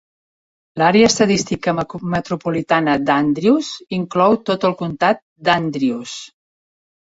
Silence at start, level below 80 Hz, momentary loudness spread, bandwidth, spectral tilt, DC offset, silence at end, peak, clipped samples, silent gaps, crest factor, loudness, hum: 0.75 s; -52 dBFS; 10 LU; 8 kHz; -5 dB/octave; under 0.1%; 0.9 s; -2 dBFS; under 0.1%; 5.22-5.36 s; 16 dB; -17 LUFS; none